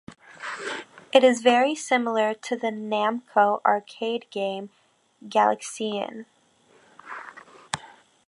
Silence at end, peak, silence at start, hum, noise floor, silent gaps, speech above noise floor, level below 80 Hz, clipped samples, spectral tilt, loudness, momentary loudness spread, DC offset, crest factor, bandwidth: 0.4 s; -2 dBFS; 0.1 s; none; -59 dBFS; none; 36 dB; -74 dBFS; under 0.1%; -3.5 dB/octave; -24 LUFS; 19 LU; under 0.1%; 24 dB; 11.5 kHz